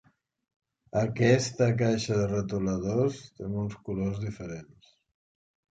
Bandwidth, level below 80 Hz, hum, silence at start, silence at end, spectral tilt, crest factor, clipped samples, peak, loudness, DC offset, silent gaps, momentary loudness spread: 9.2 kHz; -54 dBFS; none; 0.95 s; 1.1 s; -6.5 dB/octave; 20 dB; under 0.1%; -10 dBFS; -28 LUFS; under 0.1%; none; 13 LU